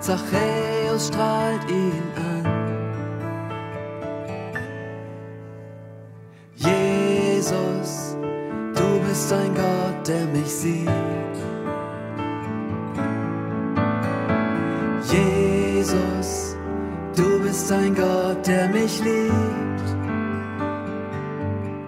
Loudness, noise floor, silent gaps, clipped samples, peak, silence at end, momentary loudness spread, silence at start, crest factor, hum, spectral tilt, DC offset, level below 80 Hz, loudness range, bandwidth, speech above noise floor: -23 LUFS; -44 dBFS; none; under 0.1%; -6 dBFS; 0 s; 11 LU; 0 s; 18 dB; none; -5.5 dB/octave; under 0.1%; -48 dBFS; 7 LU; 16 kHz; 22 dB